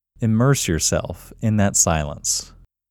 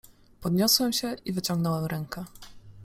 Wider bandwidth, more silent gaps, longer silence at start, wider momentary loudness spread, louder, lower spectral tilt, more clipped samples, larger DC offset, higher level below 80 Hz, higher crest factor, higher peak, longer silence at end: first, 19.5 kHz vs 16.5 kHz; neither; first, 0.2 s vs 0.05 s; second, 9 LU vs 16 LU; first, -19 LUFS vs -26 LUFS; about the same, -4 dB/octave vs -4 dB/octave; neither; neither; first, -38 dBFS vs -56 dBFS; about the same, 18 dB vs 22 dB; first, -2 dBFS vs -6 dBFS; first, 0.45 s vs 0 s